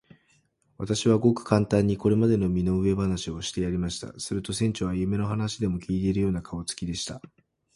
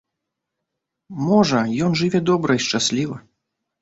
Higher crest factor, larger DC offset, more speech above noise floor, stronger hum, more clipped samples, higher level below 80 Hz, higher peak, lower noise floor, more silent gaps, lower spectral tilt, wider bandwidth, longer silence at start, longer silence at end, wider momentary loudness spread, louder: about the same, 22 dB vs 18 dB; neither; second, 41 dB vs 62 dB; neither; neither; first, -46 dBFS vs -56 dBFS; about the same, -4 dBFS vs -4 dBFS; second, -67 dBFS vs -81 dBFS; neither; about the same, -6 dB/octave vs -5 dB/octave; first, 11.5 kHz vs 8 kHz; second, 0.8 s vs 1.1 s; about the same, 0.6 s vs 0.6 s; about the same, 10 LU vs 11 LU; second, -26 LUFS vs -19 LUFS